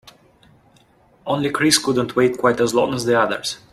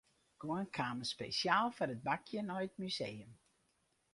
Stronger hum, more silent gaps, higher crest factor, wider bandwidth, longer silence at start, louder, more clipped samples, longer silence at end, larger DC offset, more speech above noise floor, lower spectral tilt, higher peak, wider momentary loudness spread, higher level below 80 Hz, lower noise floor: neither; neither; second, 18 dB vs 24 dB; first, 15 kHz vs 11.5 kHz; second, 0.05 s vs 0.4 s; first, -18 LUFS vs -39 LUFS; neither; second, 0.15 s vs 0.8 s; neither; second, 36 dB vs 40 dB; about the same, -3.5 dB/octave vs -4.5 dB/octave; first, -2 dBFS vs -18 dBFS; about the same, 8 LU vs 9 LU; first, -56 dBFS vs -76 dBFS; second, -55 dBFS vs -79 dBFS